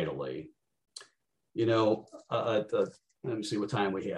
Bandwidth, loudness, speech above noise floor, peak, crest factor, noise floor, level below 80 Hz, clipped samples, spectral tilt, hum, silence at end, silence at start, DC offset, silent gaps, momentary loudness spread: 11.5 kHz; -32 LUFS; 43 dB; -16 dBFS; 18 dB; -74 dBFS; -72 dBFS; under 0.1%; -6 dB/octave; none; 0 s; 0 s; under 0.1%; none; 22 LU